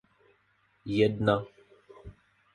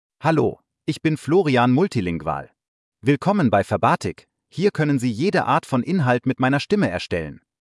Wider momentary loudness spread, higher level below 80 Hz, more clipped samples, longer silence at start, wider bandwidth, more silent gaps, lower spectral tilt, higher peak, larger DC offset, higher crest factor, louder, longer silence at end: first, 26 LU vs 10 LU; about the same, -58 dBFS vs -56 dBFS; neither; first, 0.85 s vs 0.2 s; about the same, 11 kHz vs 12 kHz; second, none vs 2.68-2.92 s; about the same, -7.5 dB/octave vs -7 dB/octave; second, -10 dBFS vs -4 dBFS; neither; first, 22 dB vs 16 dB; second, -28 LUFS vs -21 LUFS; about the same, 0.45 s vs 0.45 s